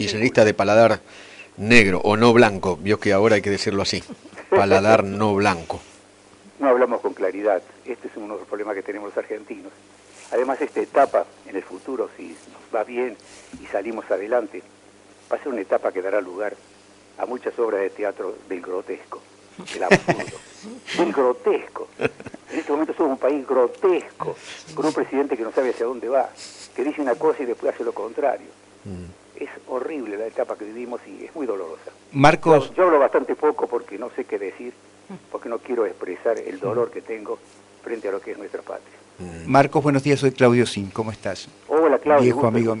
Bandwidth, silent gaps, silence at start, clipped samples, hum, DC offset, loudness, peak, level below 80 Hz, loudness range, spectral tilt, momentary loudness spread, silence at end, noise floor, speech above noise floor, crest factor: 11 kHz; none; 0 s; under 0.1%; none; under 0.1%; -21 LUFS; -2 dBFS; -52 dBFS; 10 LU; -5.5 dB/octave; 19 LU; 0 s; -50 dBFS; 29 dB; 20 dB